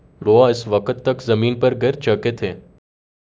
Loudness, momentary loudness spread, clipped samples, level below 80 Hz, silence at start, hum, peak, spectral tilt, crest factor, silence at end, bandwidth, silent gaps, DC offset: -18 LUFS; 11 LU; under 0.1%; -50 dBFS; 0.2 s; none; 0 dBFS; -7 dB/octave; 18 dB; 0.8 s; 7.8 kHz; none; under 0.1%